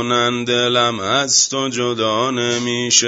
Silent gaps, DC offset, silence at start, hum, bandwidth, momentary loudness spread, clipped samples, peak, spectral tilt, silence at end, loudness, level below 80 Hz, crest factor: none; under 0.1%; 0 s; none; 8 kHz; 5 LU; under 0.1%; 0 dBFS; -2 dB/octave; 0 s; -16 LUFS; -60 dBFS; 18 dB